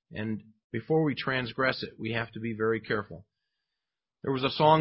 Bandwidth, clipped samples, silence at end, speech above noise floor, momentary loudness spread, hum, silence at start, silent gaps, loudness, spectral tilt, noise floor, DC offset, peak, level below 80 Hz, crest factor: 5.8 kHz; under 0.1%; 0 s; 60 dB; 13 LU; none; 0.1 s; 0.64-0.70 s; -30 LUFS; -10 dB/octave; -89 dBFS; under 0.1%; -8 dBFS; -62 dBFS; 22 dB